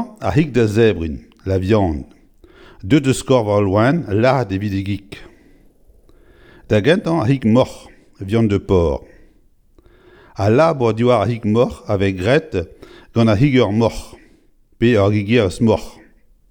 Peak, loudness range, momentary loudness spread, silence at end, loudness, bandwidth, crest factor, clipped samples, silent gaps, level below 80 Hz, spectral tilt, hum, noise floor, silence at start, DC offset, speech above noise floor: 0 dBFS; 3 LU; 12 LU; 0.6 s; -17 LUFS; 17 kHz; 18 dB; under 0.1%; none; -40 dBFS; -7 dB/octave; none; -52 dBFS; 0 s; under 0.1%; 37 dB